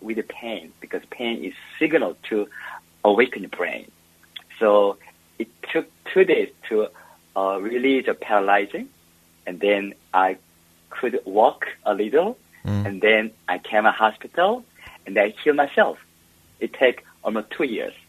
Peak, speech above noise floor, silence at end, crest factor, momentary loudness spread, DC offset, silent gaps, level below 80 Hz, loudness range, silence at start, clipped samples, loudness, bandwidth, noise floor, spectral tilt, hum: 0 dBFS; 35 dB; 0.15 s; 22 dB; 16 LU; under 0.1%; none; -66 dBFS; 3 LU; 0 s; under 0.1%; -22 LUFS; 13.5 kHz; -56 dBFS; -6 dB/octave; none